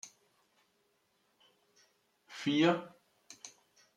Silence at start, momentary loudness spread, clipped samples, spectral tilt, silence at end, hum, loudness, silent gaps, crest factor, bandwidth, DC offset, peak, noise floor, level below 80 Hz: 0.05 s; 25 LU; under 0.1%; -5 dB/octave; 0.5 s; none; -32 LUFS; none; 24 dB; 12 kHz; under 0.1%; -16 dBFS; -76 dBFS; -84 dBFS